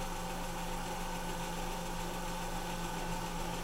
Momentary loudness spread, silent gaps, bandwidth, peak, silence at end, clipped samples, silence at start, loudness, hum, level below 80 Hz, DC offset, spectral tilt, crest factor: 1 LU; none; 16 kHz; -26 dBFS; 0 s; under 0.1%; 0 s; -40 LUFS; none; -42 dBFS; under 0.1%; -4 dB/octave; 12 dB